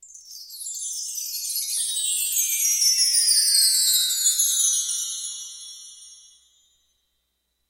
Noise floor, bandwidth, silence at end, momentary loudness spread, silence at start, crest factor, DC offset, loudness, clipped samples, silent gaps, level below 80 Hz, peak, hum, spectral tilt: -74 dBFS; 16 kHz; 1.55 s; 20 LU; 0 s; 18 dB; under 0.1%; -19 LUFS; under 0.1%; none; -72 dBFS; -6 dBFS; none; 8 dB/octave